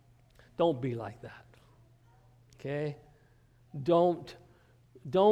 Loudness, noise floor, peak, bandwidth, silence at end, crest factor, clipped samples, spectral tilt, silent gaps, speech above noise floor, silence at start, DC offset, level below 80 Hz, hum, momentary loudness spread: -32 LUFS; -63 dBFS; -12 dBFS; 9.6 kHz; 0 s; 20 dB; under 0.1%; -8 dB/octave; none; 33 dB; 0.6 s; under 0.1%; -66 dBFS; none; 23 LU